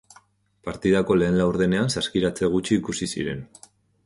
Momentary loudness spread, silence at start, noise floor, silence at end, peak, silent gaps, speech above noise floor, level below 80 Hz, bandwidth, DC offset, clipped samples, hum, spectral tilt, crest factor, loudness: 11 LU; 0.65 s; -58 dBFS; 0.6 s; -8 dBFS; none; 35 dB; -48 dBFS; 11.5 kHz; under 0.1%; under 0.1%; none; -5.5 dB/octave; 16 dB; -23 LUFS